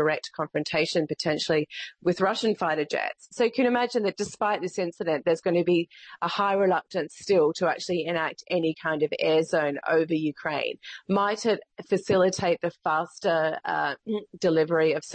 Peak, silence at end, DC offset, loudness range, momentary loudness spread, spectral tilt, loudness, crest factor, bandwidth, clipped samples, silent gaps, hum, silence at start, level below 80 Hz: -12 dBFS; 0 s; under 0.1%; 1 LU; 7 LU; -5 dB/octave; -26 LUFS; 14 dB; 8.8 kHz; under 0.1%; none; none; 0 s; -68 dBFS